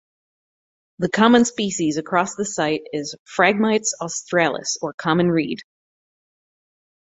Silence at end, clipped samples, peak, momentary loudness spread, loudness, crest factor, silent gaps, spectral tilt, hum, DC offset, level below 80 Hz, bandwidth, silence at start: 1.4 s; under 0.1%; -2 dBFS; 12 LU; -20 LUFS; 20 dB; 3.19-3.26 s, 4.94-4.98 s; -4 dB/octave; none; under 0.1%; -62 dBFS; 8.4 kHz; 1 s